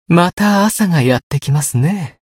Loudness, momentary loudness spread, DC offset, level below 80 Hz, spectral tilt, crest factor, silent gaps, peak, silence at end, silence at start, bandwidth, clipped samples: -14 LUFS; 5 LU; under 0.1%; -48 dBFS; -5.5 dB/octave; 14 dB; 0.33-0.37 s, 1.23-1.30 s; 0 dBFS; 0.25 s; 0.1 s; 16.5 kHz; under 0.1%